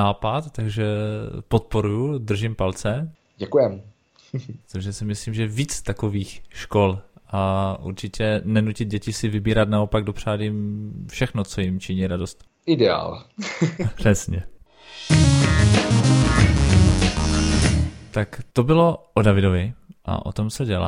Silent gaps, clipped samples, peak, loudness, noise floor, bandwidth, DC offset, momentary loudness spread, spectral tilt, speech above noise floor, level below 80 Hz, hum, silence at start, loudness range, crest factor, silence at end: none; under 0.1%; -2 dBFS; -22 LUFS; -42 dBFS; 13 kHz; under 0.1%; 15 LU; -6 dB/octave; 21 dB; -32 dBFS; none; 0 s; 8 LU; 20 dB; 0 s